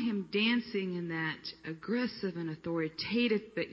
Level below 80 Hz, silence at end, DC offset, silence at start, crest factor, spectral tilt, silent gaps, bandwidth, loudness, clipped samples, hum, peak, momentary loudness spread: -70 dBFS; 0 s; under 0.1%; 0 s; 16 dB; -7.5 dB/octave; none; 6.8 kHz; -34 LUFS; under 0.1%; none; -18 dBFS; 9 LU